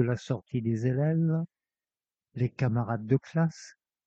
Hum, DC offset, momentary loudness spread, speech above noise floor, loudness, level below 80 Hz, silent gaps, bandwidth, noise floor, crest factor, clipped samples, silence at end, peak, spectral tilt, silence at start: none; under 0.1%; 6 LU; over 62 dB; -29 LUFS; -64 dBFS; none; 7.8 kHz; under -90 dBFS; 18 dB; under 0.1%; 0.35 s; -12 dBFS; -8.5 dB/octave; 0 s